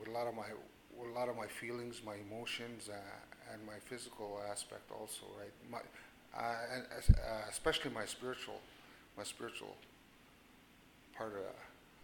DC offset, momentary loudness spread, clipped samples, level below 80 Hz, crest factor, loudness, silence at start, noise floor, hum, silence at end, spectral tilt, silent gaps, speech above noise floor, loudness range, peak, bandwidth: under 0.1%; 21 LU; under 0.1%; -46 dBFS; 30 dB; -43 LUFS; 0 s; -64 dBFS; none; 0 s; -4.5 dB/octave; none; 23 dB; 10 LU; -12 dBFS; 18.5 kHz